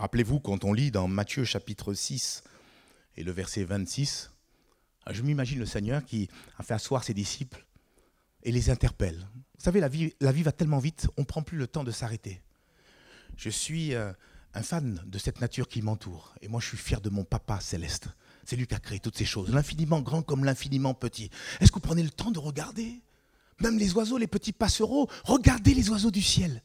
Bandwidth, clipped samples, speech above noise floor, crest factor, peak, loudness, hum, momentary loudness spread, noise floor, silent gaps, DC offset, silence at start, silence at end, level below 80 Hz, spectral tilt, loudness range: 16 kHz; under 0.1%; 39 dB; 26 dB; -4 dBFS; -29 LUFS; none; 14 LU; -68 dBFS; none; under 0.1%; 0 s; 0.05 s; -40 dBFS; -5.5 dB/octave; 7 LU